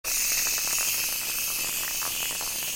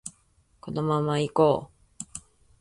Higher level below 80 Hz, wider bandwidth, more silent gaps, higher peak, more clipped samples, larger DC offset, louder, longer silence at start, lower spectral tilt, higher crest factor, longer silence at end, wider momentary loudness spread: first, -52 dBFS vs -60 dBFS; first, 17 kHz vs 11.5 kHz; neither; about the same, -10 dBFS vs -8 dBFS; neither; neither; about the same, -25 LUFS vs -25 LUFS; about the same, 0.05 s vs 0.05 s; second, 1.5 dB/octave vs -6 dB/octave; about the same, 18 dB vs 20 dB; second, 0 s vs 0.4 s; second, 4 LU vs 20 LU